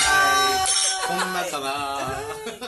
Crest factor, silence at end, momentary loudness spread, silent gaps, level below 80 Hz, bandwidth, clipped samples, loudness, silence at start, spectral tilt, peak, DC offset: 14 dB; 0 s; 12 LU; none; -50 dBFS; 12.5 kHz; under 0.1%; -21 LUFS; 0 s; -0.5 dB/octave; -8 dBFS; under 0.1%